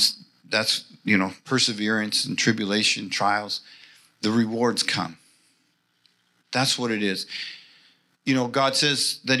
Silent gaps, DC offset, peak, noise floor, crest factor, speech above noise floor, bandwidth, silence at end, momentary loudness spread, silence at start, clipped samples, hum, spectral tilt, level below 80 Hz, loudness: none; under 0.1%; -6 dBFS; -68 dBFS; 20 dB; 44 dB; 14.5 kHz; 0 s; 11 LU; 0 s; under 0.1%; 60 Hz at -60 dBFS; -3 dB/octave; -80 dBFS; -23 LUFS